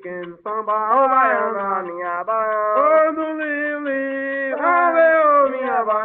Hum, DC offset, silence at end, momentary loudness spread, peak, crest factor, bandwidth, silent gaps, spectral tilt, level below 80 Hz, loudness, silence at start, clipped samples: none; under 0.1%; 0 s; 10 LU; -4 dBFS; 14 dB; 4 kHz; none; -8.5 dB/octave; -66 dBFS; -18 LUFS; 0.05 s; under 0.1%